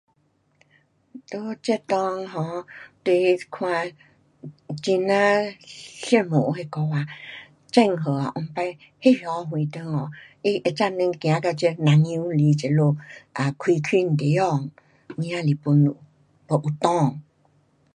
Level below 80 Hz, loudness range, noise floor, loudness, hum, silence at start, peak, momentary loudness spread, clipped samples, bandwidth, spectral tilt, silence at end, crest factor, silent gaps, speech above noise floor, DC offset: -68 dBFS; 4 LU; -66 dBFS; -23 LUFS; none; 1.15 s; -2 dBFS; 16 LU; under 0.1%; 10.5 kHz; -7 dB/octave; 0.75 s; 22 dB; none; 44 dB; under 0.1%